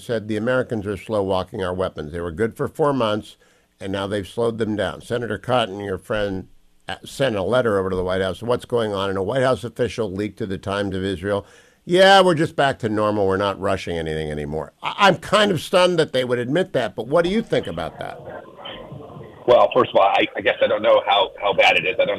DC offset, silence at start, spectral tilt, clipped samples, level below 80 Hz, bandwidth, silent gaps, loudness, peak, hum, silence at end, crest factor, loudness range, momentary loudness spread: under 0.1%; 0 s; -5 dB/octave; under 0.1%; -48 dBFS; 14 kHz; none; -20 LUFS; -4 dBFS; none; 0 s; 16 dB; 6 LU; 13 LU